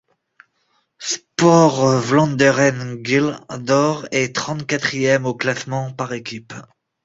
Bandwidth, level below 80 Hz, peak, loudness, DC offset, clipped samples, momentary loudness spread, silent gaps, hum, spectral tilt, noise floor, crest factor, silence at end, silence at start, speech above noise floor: 8 kHz; -58 dBFS; -2 dBFS; -18 LUFS; under 0.1%; under 0.1%; 15 LU; none; none; -5 dB/octave; -66 dBFS; 18 dB; 0.4 s; 1 s; 48 dB